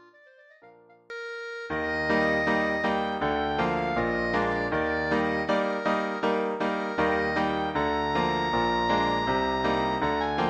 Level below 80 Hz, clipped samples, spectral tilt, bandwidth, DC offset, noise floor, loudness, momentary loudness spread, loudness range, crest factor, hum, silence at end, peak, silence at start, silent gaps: -48 dBFS; under 0.1%; -6 dB/octave; 9 kHz; under 0.1%; -55 dBFS; -26 LUFS; 4 LU; 2 LU; 14 dB; none; 0 s; -12 dBFS; 0.65 s; none